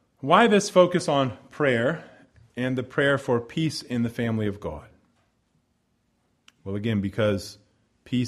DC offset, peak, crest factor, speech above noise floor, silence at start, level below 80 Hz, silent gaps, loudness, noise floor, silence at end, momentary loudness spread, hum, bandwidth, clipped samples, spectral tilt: under 0.1%; -4 dBFS; 22 dB; 47 dB; 0.25 s; -58 dBFS; none; -24 LUFS; -71 dBFS; 0 s; 17 LU; none; 13.5 kHz; under 0.1%; -5.5 dB/octave